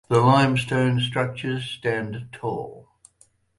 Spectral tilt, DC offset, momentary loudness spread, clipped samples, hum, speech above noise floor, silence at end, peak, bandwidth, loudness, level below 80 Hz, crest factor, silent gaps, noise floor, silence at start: -6.5 dB/octave; under 0.1%; 15 LU; under 0.1%; none; 38 dB; 0.8 s; -4 dBFS; 11.5 kHz; -23 LUFS; -56 dBFS; 18 dB; none; -60 dBFS; 0.1 s